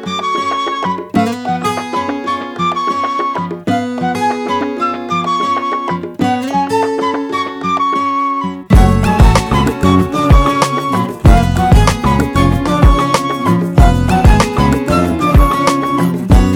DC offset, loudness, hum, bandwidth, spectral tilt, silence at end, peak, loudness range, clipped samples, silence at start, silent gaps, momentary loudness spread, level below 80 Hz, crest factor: under 0.1%; -13 LUFS; none; 16.5 kHz; -6.5 dB/octave; 0 s; 0 dBFS; 5 LU; under 0.1%; 0 s; none; 7 LU; -18 dBFS; 12 dB